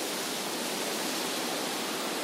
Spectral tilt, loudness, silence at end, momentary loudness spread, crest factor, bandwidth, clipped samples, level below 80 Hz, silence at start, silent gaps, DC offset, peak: -1.5 dB/octave; -31 LUFS; 0 s; 1 LU; 14 dB; 16 kHz; under 0.1%; -80 dBFS; 0 s; none; under 0.1%; -20 dBFS